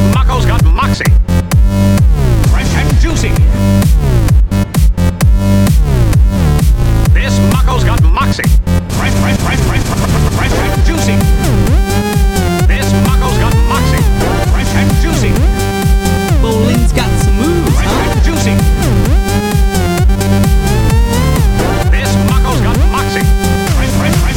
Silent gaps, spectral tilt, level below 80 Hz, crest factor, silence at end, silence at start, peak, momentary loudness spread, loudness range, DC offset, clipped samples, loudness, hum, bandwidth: none; -6 dB/octave; -12 dBFS; 8 dB; 0 s; 0 s; 0 dBFS; 2 LU; 1 LU; 0.3%; under 0.1%; -11 LUFS; none; 17.5 kHz